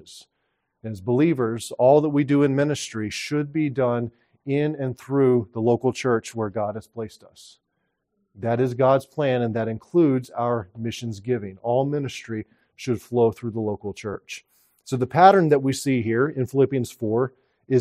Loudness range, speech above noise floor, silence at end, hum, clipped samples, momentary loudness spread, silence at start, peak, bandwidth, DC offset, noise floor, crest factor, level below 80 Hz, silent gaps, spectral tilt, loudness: 6 LU; 53 dB; 0 s; none; under 0.1%; 14 LU; 0.1 s; 0 dBFS; 14.5 kHz; under 0.1%; -76 dBFS; 22 dB; -64 dBFS; none; -6.5 dB/octave; -23 LUFS